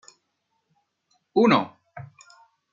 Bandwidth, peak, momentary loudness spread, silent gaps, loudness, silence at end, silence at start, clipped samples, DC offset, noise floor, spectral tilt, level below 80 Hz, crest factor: 7.6 kHz; -4 dBFS; 25 LU; none; -21 LUFS; 0.7 s; 1.35 s; under 0.1%; under 0.1%; -75 dBFS; -6.5 dB/octave; -72 dBFS; 24 dB